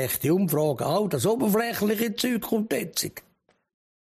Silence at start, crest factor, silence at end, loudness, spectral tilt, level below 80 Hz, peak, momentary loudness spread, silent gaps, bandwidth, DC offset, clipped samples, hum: 0 s; 14 dB; 0.9 s; -25 LUFS; -5 dB/octave; -62 dBFS; -12 dBFS; 6 LU; none; 15.5 kHz; under 0.1%; under 0.1%; none